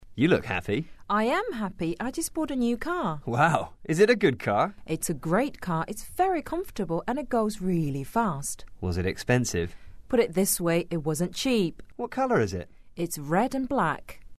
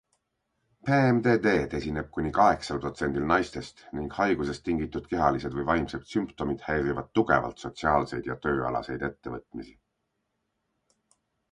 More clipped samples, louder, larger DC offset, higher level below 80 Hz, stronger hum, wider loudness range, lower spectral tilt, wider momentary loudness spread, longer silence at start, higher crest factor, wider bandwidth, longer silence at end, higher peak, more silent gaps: neither; about the same, -27 LUFS vs -27 LUFS; first, 0.5% vs under 0.1%; about the same, -48 dBFS vs -48 dBFS; neither; second, 3 LU vs 6 LU; second, -5 dB/octave vs -7 dB/octave; second, 9 LU vs 13 LU; second, 0 s vs 0.85 s; about the same, 20 dB vs 22 dB; first, 13.5 kHz vs 11 kHz; second, 0 s vs 1.8 s; about the same, -8 dBFS vs -6 dBFS; neither